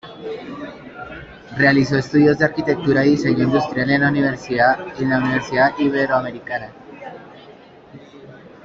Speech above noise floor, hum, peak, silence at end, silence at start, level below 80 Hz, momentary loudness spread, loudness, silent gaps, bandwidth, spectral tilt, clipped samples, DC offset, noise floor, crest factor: 25 dB; none; -2 dBFS; 0.15 s; 0.05 s; -50 dBFS; 20 LU; -17 LUFS; none; 7.4 kHz; -7 dB/octave; under 0.1%; under 0.1%; -43 dBFS; 18 dB